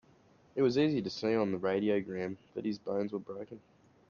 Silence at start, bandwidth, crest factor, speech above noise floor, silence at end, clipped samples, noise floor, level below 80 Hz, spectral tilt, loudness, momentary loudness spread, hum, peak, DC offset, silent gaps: 0.55 s; 7 kHz; 16 dB; 31 dB; 0.5 s; under 0.1%; -64 dBFS; -72 dBFS; -7 dB/octave; -33 LUFS; 14 LU; none; -18 dBFS; under 0.1%; none